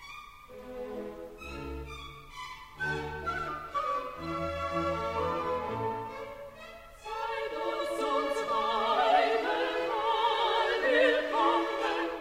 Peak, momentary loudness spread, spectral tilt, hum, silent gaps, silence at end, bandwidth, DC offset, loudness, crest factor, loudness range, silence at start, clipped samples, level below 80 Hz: -12 dBFS; 18 LU; -4.5 dB/octave; none; none; 0 s; 16 kHz; under 0.1%; -30 LUFS; 18 dB; 10 LU; 0 s; under 0.1%; -54 dBFS